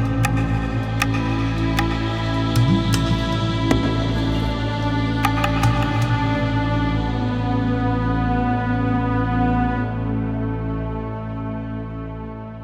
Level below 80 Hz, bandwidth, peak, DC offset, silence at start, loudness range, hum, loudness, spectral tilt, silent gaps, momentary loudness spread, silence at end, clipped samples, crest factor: -30 dBFS; 15 kHz; -2 dBFS; under 0.1%; 0 s; 3 LU; none; -21 LUFS; -6.5 dB/octave; none; 9 LU; 0 s; under 0.1%; 18 dB